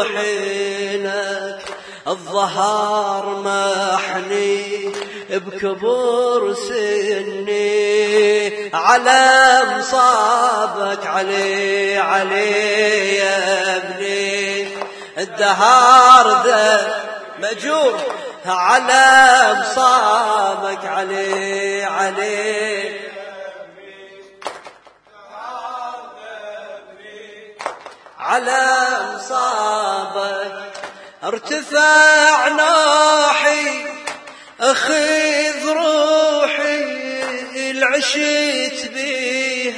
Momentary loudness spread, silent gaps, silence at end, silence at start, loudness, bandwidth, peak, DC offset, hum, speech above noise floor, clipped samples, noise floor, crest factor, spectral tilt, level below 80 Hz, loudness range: 18 LU; none; 0 s; 0 s; -15 LUFS; 11 kHz; 0 dBFS; under 0.1%; none; 31 dB; under 0.1%; -46 dBFS; 16 dB; -1.5 dB/octave; -64 dBFS; 12 LU